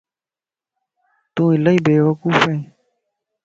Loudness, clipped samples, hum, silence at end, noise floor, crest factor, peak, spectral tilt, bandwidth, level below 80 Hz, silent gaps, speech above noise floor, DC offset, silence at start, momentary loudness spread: -16 LUFS; under 0.1%; none; 0.8 s; under -90 dBFS; 20 dB; 0 dBFS; -7 dB/octave; 7.6 kHz; -60 dBFS; none; over 75 dB; under 0.1%; 1.35 s; 9 LU